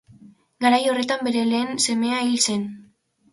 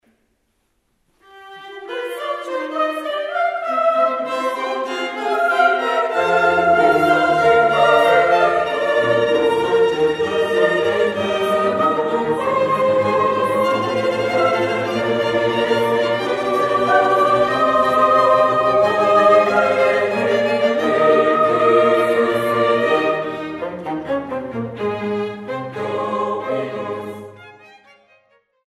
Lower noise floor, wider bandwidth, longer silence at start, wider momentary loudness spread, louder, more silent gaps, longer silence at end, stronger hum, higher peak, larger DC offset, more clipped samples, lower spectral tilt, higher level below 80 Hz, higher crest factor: second, -57 dBFS vs -67 dBFS; second, 11.5 kHz vs 15 kHz; second, 0.25 s vs 1.35 s; second, 4 LU vs 12 LU; second, -21 LUFS vs -17 LUFS; neither; second, 0.5 s vs 1.15 s; neither; about the same, -4 dBFS vs -2 dBFS; neither; neither; second, -2.5 dB/octave vs -5 dB/octave; second, -68 dBFS vs -56 dBFS; about the same, 18 dB vs 16 dB